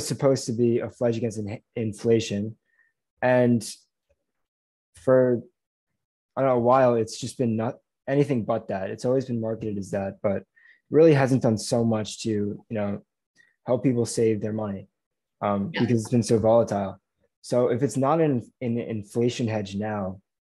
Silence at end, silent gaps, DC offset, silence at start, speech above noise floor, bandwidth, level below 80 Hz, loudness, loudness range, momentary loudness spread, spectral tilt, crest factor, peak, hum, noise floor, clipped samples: 0.35 s; 3.10-3.17 s, 4.48-4.93 s, 5.66-5.87 s, 6.05-6.29 s, 13.26-13.34 s, 15.06-15.11 s, 17.37-17.42 s; under 0.1%; 0 s; 50 dB; 12.5 kHz; -64 dBFS; -25 LUFS; 3 LU; 12 LU; -6.5 dB/octave; 18 dB; -6 dBFS; none; -74 dBFS; under 0.1%